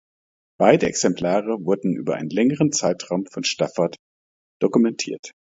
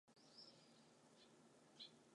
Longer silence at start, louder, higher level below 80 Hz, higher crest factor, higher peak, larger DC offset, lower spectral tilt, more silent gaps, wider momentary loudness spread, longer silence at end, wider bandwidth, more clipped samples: first, 0.6 s vs 0.05 s; first, -21 LUFS vs -65 LUFS; first, -60 dBFS vs under -90 dBFS; about the same, 22 dB vs 22 dB; first, 0 dBFS vs -46 dBFS; neither; first, -4.5 dB/octave vs -3 dB/octave; first, 3.99-4.60 s, 5.19-5.23 s vs none; about the same, 8 LU vs 8 LU; first, 0.2 s vs 0 s; second, 7.8 kHz vs 11 kHz; neither